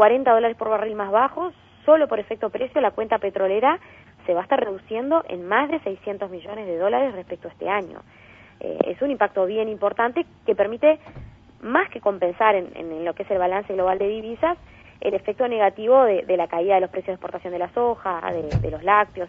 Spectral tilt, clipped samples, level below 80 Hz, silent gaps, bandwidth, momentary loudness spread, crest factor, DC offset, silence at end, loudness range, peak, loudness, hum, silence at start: -8 dB/octave; under 0.1%; -50 dBFS; none; 6.2 kHz; 12 LU; 20 dB; under 0.1%; 0 s; 4 LU; -2 dBFS; -22 LUFS; none; 0 s